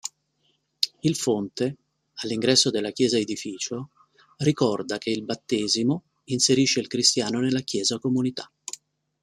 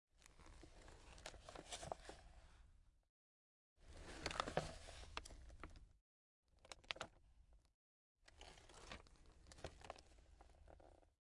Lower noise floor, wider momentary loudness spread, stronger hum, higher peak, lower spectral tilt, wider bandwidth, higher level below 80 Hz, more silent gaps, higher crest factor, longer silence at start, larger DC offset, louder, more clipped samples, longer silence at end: second, -70 dBFS vs under -90 dBFS; second, 16 LU vs 20 LU; neither; first, 0 dBFS vs -22 dBFS; about the same, -3.5 dB/octave vs -3 dB/octave; first, 14 kHz vs 12 kHz; about the same, -66 dBFS vs -66 dBFS; second, none vs 3.09-3.76 s, 6.01-6.43 s, 7.74-8.15 s; second, 24 dB vs 34 dB; about the same, 0.05 s vs 0.15 s; neither; first, -24 LUFS vs -54 LUFS; neither; first, 0.5 s vs 0.15 s